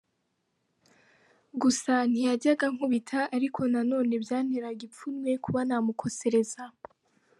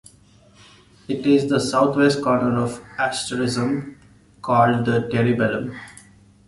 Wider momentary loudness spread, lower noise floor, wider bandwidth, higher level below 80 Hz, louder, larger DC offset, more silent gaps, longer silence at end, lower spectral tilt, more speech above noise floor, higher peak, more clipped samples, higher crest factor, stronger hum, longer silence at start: about the same, 11 LU vs 13 LU; first, -77 dBFS vs -52 dBFS; about the same, 11.5 kHz vs 11.5 kHz; second, -72 dBFS vs -54 dBFS; second, -28 LUFS vs -20 LUFS; neither; neither; first, 0.7 s vs 0.55 s; second, -4.5 dB/octave vs -6 dB/octave; first, 49 dB vs 32 dB; second, -12 dBFS vs -4 dBFS; neither; about the same, 16 dB vs 18 dB; neither; first, 1.55 s vs 1.1 s